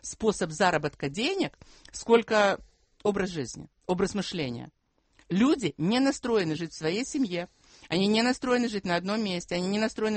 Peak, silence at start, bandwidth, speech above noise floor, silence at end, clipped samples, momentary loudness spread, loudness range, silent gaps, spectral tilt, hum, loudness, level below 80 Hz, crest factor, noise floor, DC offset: -6 dBFS; 0.05 s; 8.8 kHz; 38 dB; 0 s; under 0.1%; 11 LU; 2 LU; none; -5 dB/octave; none; -28 LUFS; -58 dBFS; 22 dB; -65 dBFS; under 0.1%